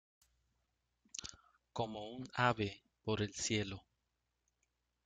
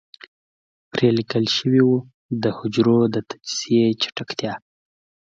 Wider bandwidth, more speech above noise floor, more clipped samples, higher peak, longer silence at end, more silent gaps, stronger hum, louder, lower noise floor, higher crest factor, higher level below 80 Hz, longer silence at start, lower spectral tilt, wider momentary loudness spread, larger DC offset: first, 9.6 kHz vs 7.8 kHz; second, 47 dB vs over 70 dB; neither; second, -18 dBFS vs -4 dBFS; first, 1.25 s vs 0.8 s; second, none vs 2.14-2.29 s; neither; second, -40 LUFS vs -21 LUFS; second, -86 dBFS vs under -90 dBFS; first, 26 dB vs 18 dB; second, -68 dBFS vs -62 dBFS; first, 1.2 s vs 0.95 s; second, -4 dB/octave vs -5.5 dB/octave; first, 14 LU vs 11 LU; neither